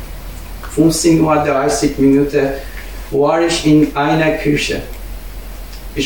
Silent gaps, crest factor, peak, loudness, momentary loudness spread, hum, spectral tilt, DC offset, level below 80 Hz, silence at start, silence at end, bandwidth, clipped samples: none; 14 dB; 0 dBFS; -14 LUFS; 19 LU; none; -5 dB/octave; 1%; -30 dBFS; 0 s; 0 s; 17.5 kHz; under 0.1%